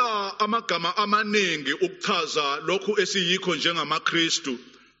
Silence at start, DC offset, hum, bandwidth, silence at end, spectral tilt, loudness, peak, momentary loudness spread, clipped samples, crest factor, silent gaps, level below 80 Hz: 0 s; under 0.1%; none; 8 kHz; 0.35 s; -1 dB/octave; -24 LUFS; -6 dBFS; 4 LU; under 0.1%; 18 dB; none; -74 dBFS